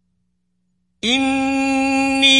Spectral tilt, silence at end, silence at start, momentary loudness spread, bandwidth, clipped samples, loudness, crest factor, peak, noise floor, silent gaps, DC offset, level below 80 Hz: -2 dB/octave; 0 s; 1.05 s; 3 LU; 11 kHz; under 0.1%; -17 LUFS; 18 dB; 0 dBFS; -69 dBFS; none; under 0.1%; -50 dBFS